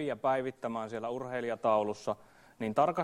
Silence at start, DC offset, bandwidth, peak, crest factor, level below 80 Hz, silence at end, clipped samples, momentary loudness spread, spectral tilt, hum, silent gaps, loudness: 0 s; under 0.1%; 12.5 kHz; -14 dBFS; 18 dB; -70 dBFS; 0 s; under 0.1%; 9 LU; -6 dB/octave; none; none; -33 LUFS